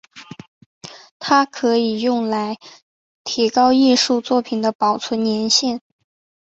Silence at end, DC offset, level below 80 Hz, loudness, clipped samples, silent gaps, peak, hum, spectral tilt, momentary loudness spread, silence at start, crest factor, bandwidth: 0.7 s; under 0.1%; -64 dBFS; -17 LUFS; under 0.1%; 0.48-0.81 s, 1.11-1.20 s, 2.82-3.25 s, 4.75-4.79 s; -2 dBFS; none; -3 dB/octave; 19 LU; 0.15 s; 18 dB; 8.2 kHz